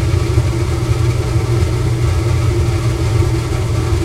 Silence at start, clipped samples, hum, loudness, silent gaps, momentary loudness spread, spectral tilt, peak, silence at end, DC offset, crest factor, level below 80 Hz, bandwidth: 0 s; under 0.1%; none; -16 LUFS; none; 2 LU; -6.5 dB/octave; 0 dBFS; 0 s; under 0.1%; 14 dB; -22 dBFS; 13.5 kHz